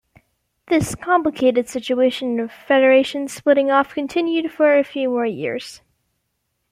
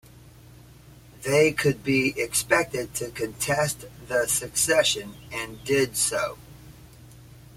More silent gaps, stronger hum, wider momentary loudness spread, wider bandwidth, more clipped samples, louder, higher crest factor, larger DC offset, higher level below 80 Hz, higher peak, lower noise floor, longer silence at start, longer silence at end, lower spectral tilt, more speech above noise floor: neither; neither; second, 9 LU vs 13 LU; about the same, 15 kHz vs 16.5 kHz; neither; first, -19 LUFS vs -24 LUFS; about the same, 16 dB vs 20 dB; neither; about the same, -54 dBFS vs -54 dBFS; first, -2 dBFS vs -6 dBFS; first, -73 dBFS vs -49 dBFS; first, 0.7 s vs 0.15 s; first, 0.95 s vs 0.2 s; first, -5 dB/octave vs -3 dB/octave; first, 55 dB vs 24 dB